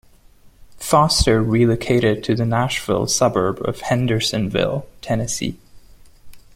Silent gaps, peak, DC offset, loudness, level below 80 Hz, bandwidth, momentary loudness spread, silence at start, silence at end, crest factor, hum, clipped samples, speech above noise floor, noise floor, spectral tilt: none; -2 dBFS; under 0.1%; -19 LUFS; -38 dBFS; 16.5 kHz; 9 LU; 0.45 s; 0.15 s; 18 dB; none; under 0.1%; 30 dB; -48 dBFS; -5 dB/octave